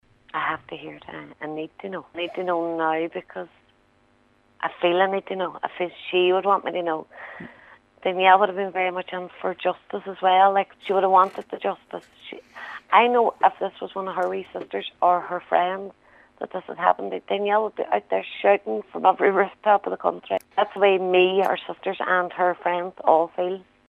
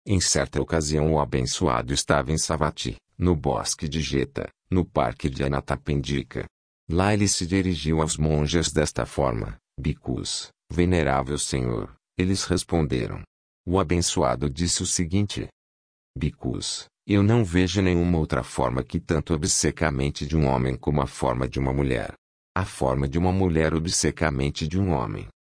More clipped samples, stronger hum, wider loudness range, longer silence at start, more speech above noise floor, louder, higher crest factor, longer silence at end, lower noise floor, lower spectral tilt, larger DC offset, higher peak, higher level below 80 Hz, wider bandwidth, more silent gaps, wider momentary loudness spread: neither; neither; first, 6 LU vs 2 LU; first, 0.35 s vs 0.05 s; second, 38 dB vs over 66 dB; about the same, -23 LUFS vs -25 LUFS; about the same, 22 dB vs 18 dB; about the same, 0.25 s vs 0.25 s; second, -61 dBFS vs under -90 dBFS; first, -6.5 dB/octave vs -5 dB/octave; neither; first, -2 dBFS vs -6 dBFS; second, -72 dBFS vs -38 dBFS; first, 12.5 kHz vs 10.5 kHz; second, none vs 6.51-6.87 s, 13.27-13.64 s, 15.52-16.14 s, 22.18-22.55 s; first, 18 LU vs 9 LU